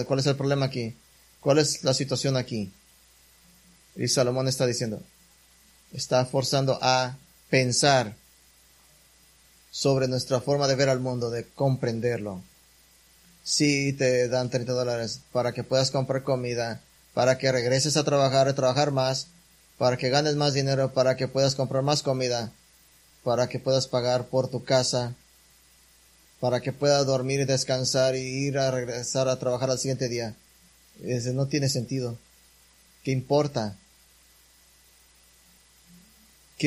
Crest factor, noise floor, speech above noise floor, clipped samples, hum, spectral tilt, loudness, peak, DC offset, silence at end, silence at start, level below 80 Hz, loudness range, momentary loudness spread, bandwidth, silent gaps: 22 dB; -58 dBFS; 33 dB; under 0.1%; none; -4.5 dB/octave; -25 LUFS; -6 dBFS; under 0.1%; 0 s; 0 s; -60 dBFS; 5 LU; 11 LU; 15 kHz; none